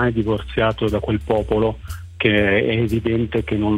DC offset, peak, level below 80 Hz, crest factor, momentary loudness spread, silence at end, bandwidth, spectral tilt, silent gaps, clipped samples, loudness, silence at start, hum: under 0.1%; -4 dBFS; -34 dBFS; 16 dB; 6 LU; 0 s; 15.5 kHz; -7.5 dB/octave; none; under 0.1%; -20 LUFS; 0 s; none